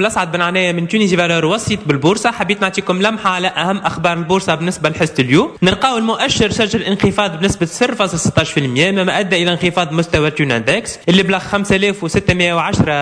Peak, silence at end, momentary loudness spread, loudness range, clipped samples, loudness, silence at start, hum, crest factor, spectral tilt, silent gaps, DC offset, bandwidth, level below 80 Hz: 0 dBFS; 0 s; 3 LU; 1 LU; under 0.1%; -14 LUFS; 0 s; none; 14 dB; -4.5 dB/octave; none; under 0.1%; 11 kHz; -40 dBFS